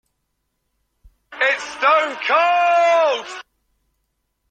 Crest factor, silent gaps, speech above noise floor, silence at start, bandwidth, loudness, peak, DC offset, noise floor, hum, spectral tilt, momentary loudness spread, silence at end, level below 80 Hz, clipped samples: 16 dB; none; 56 dB; 1.3 s; 9.2 kHz; -17 LUFS; -4 dBFS; under 0.1%; -73 dBFS; none; -0.5 dB/octave; 10 LU; 1.1 s; -62 dBFS; under 0.1%